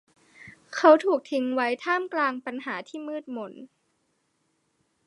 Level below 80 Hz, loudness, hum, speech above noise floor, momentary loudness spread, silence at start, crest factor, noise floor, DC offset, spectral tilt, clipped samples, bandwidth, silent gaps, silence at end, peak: -82 dBFS; -25 LUFS; none; 48 dB; 18 LU; 0.4 s; 24 dB; -73 dBFS; under 0.1%; -4 dB/octave; under 0.1%; 11 kHz; none; 1.4 s; -4 dBFS